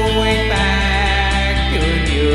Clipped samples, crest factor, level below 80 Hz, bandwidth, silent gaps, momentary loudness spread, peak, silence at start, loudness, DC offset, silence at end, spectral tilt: under 0.1%; 12 dB; -20 dBFS; 11.5 kHz; none; 1 LU; -2 dBFS; 0 s; -16 LUFS; under 0.1%; 0 s; -5 dB/octave